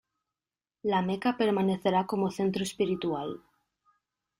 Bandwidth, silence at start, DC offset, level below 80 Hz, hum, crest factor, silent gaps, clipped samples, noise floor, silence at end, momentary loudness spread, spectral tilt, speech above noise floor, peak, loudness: 15.5 kHz; 0.85 s; under 0.1%; -66 dBFS; none; 18 dB; none; under 0.1%; under -90 dBFS; 1 s; 9 LU; -6 dB/octave; over 62 dB; -12 dBFS; -29 LUFS